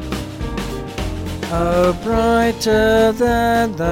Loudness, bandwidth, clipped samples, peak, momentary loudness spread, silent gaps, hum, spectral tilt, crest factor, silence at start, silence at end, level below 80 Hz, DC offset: -17 LUFS; 17 kHz; under 0.1%; -4 dBFS; 11 LU; none; none; -5.5 dB/octave; 14 dB; 0 s; 0 s; -30 dBFS; under 0.1%